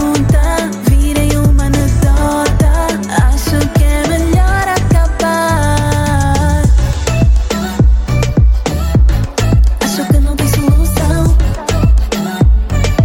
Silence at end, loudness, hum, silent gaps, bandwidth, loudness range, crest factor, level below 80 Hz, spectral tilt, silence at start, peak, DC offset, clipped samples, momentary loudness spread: 0 s; -12 LUFS; none; none; 16.5 kHz; 0 LU; 10 dB; -12 dBFS; -6 dB/octave; 0 s; 0 dBFS; under 0.1%; under 0.1%; 3 LU